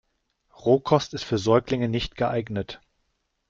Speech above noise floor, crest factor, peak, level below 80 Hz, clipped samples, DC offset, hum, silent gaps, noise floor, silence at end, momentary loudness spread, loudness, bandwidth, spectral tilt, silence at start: 50 dB; 22 dB; -4 dBFS; -50 dBFS; under 0.1%; under 0.1%; none; none; -74 dBFS; 0.75 s; 11 LU; -24 LUFS; 7.6 kHz; -6.5 dB/octave; 0.65 s